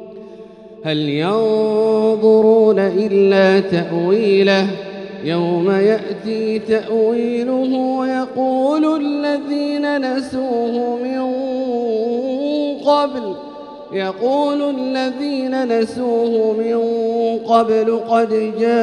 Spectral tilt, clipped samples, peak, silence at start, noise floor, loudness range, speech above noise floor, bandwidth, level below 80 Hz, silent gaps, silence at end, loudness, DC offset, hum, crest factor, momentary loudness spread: -7 dB/octave; under 0.1%; 0 dBFS; 0 s; -37 dBFS; 6 LU; 21 dB; 10 kHz; -62 dBFS; none; 0 s; -17 LUFS; under 0.1%; none; 16 dB; 9 LU